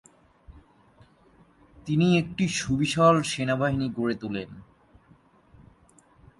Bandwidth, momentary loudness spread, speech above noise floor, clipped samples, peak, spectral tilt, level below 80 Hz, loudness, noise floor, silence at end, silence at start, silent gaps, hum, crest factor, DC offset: 11.5 kHz; 14 LU; 34 dB; under 0.1%; -6 dBFS; -5.5 dB/octave; -54 dBFS; -25 LUFS; -59 dBFS; 1.8 s; 0.5 s; none; none; 22 dB; under 0.1%